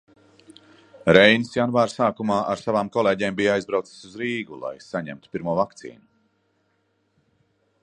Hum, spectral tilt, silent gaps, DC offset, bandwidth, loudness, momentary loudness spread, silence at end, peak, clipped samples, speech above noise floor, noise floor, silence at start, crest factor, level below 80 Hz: none; -5.5 dB/octave; none; under 0.1%; 10.5 kHz; -22 LUFS; 17 LU; 1.9 s; 0 dBFS; under 0.1%; 47 dB; -69 dBFS; 1.05 s; 24 dB; -58 dBFS